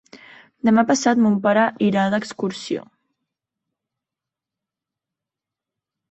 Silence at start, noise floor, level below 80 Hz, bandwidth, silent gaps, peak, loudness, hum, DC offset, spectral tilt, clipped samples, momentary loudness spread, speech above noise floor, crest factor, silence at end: 0.15 s; -87 dBFS; -66 dBFS; 8.4 kHz; none; -4 dBFS; -19 LUFS; none; under 0.1%; -5.5 dB/octave; under 0.1%; 11 LU; 69 dB; 20 dB; 3.3 s